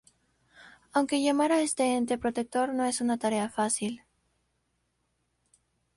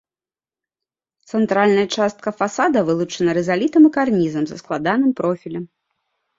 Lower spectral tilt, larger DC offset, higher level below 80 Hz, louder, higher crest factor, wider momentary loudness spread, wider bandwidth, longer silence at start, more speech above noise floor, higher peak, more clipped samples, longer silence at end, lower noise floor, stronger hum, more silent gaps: second, -3.5 dB/octave vs -6 dB/octave; neither; second, -68 dBFS vs -60 dBFS; second, -28 LUFS vs -18 LUFS; about the same, 16 dB vs 16 dB; second, 5 LU vs 12 LU; first, 11.5 kHz vs 7.8 kHz; second, 0.6 s vs 1.35 s; second, 49 dB vs over 72 dB; second, -14 dBFS vs -2 dBFS; neither; first, 2 s vs 0.7 s; second, -76 dBFS vs under -90 dBFS; neither; neither